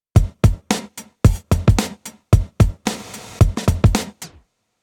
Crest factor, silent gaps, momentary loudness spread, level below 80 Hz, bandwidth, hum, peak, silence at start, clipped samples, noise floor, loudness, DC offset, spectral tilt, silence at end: 18 dB; none; 17 LU; -24 dBFS; 17 kHz; none; 0 dBFS; 0.15 s; under 0.1%; -54 dBFS; -19 LUFS; under 0.1%; -6 dB/octave; 0.55 s